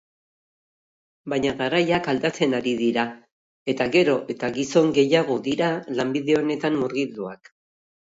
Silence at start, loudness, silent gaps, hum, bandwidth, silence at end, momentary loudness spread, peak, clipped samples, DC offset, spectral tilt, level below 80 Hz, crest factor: 1.25 s; -23 LUFS; 3.32-3.66 s; none; 8 kHz; 0.75 s; 10 LU; -4 dBFS; under 0.1%; under 0.1%; -5.5 dB/octave; -62 dBFS; 18 dB